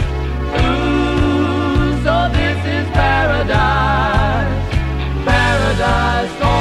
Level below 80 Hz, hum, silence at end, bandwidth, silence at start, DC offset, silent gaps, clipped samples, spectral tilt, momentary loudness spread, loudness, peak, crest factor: -22 dBFS; none; 0 s; 12 kHz; 0 s; 0.3%; none; under 0.1%; -6.5 dB/octave; 5 LU; -16 LUFS; 0 dBFS; 14 dB